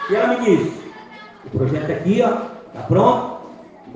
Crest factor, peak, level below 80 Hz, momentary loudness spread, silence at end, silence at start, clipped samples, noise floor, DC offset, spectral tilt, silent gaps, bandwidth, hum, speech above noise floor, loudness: 18 dB; -2 dBFS; -52 dBFS; 22 LU; 0 s; 0 s; under 0.1%; -39 dBFS; under 0.1%; -7.5 dB/octave; none; 9.2 kHz; none; 22 dB; -18 LUFS